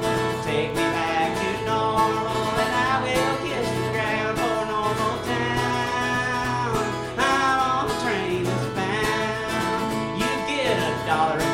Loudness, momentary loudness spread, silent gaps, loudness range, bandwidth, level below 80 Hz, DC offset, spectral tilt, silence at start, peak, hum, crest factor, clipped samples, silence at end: -23 LUFS; 4 LU; none; 1 LU; 16.5 kHz; -46 dBFS; under 0.1%; -4.5 dB/octave; 0 s; -8 dBFS; none; 16 dB; under 0.1%; 0 s